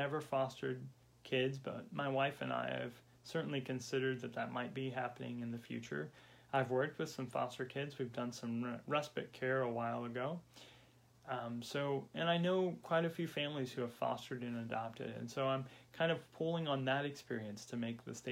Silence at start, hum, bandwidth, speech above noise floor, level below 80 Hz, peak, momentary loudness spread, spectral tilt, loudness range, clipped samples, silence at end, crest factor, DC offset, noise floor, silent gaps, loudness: 0 s; none; 16.5 kHz; 26 dB; -80 dBFS; -22 dBFS; 9 LU; -5.5 dB/octave; 3 LU; under 0.1%; 0 s; 18 dB; under 0.1%; -66 dBFS; none; -40 LUFS